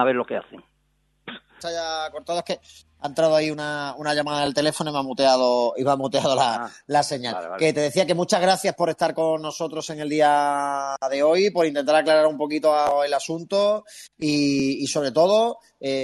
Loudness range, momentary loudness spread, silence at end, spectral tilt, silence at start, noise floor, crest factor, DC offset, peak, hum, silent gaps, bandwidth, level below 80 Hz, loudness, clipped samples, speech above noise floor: 5 LU; 10 LU; 0 s; -4 dB/octave; 0 s; -67 dBFS; 18 dB; under 0.1%; -4 dBFS; none; none; 12.5 kHz; -64 dBFS; -22 LUFS; under 0.1%; 45 dB